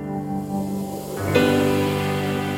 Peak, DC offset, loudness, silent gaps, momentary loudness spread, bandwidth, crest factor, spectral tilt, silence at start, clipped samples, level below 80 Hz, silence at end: -4 dBFS; under 0.1%; -22 LUFS; none; 9 LU; 16.5 kHz; 18 dB; -6 dB/octave; 0 s; under 0.1%; -50 dBFS; 0 s